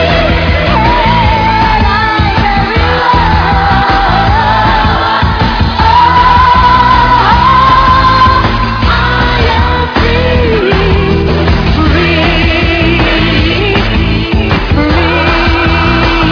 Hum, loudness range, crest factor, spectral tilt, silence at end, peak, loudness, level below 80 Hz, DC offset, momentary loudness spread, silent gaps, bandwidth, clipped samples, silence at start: none; 3 LU; 8 dB; -7 dB/octave; 0 s; 0 dBFS; -8 LUFS; -16 dBFS; under 0.1%; 5 LU; none; 5.4 kHz; 2%; 0 s